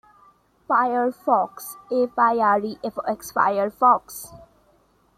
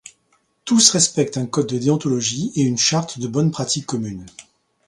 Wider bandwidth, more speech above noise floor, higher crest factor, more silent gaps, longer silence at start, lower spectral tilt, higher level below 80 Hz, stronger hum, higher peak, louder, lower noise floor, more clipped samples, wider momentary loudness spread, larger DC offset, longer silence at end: first, 15.5 kHz vs 11.5 kHz; second, 39 dB vs 45 dB; about the same, 18 dB vs 20 dB; neither; about the same, 0.7 s vs 0.65 s; about the same, -4.5 dB/octave vs -3.5 dB/octave; second, -64 dBFS vs -56 dBFS; neither; second, -4 dBFS vs 0 dBFS; second, -22 LUFS vs -18 LUFS; about the same, -61 dBFS vs -64 dBFS; neither; about the same, 13 LU vs 13 LU; neither; first, 0.8 s vs 0.45 s